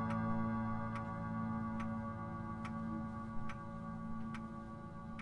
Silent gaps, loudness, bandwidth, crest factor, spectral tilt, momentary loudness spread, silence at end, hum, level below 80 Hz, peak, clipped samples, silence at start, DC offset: none; -43 LUFS; 10.5 kHz; 14 dB; -8.5 dB/octave; 9 LU; 0 s; none; -58 dBFS; -26 dBFS; under 0.1%; 0 s; under 0.1%